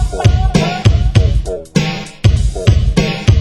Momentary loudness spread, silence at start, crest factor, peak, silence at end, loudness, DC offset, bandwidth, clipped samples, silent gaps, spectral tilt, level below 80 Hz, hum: 5 LU; 0 s; 12 dB; 0 dBFS; 0 s; -14 LUFS; under 0.1%; 11.5 kHz; 0.6%; none; -6 dB/octave; -16 dBFS; none